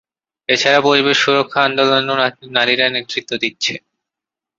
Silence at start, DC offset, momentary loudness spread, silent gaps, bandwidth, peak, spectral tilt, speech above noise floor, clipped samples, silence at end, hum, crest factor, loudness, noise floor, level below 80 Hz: 0.5 s; under 0.1%; 9 LU; none; 7.8 kHz; 0 dBFS; -3 dB/octave; 71 dB; under 0.1%; 0.8 s; none; 16 dB; -15 LUFS; -86 dBFS; -64 dBFS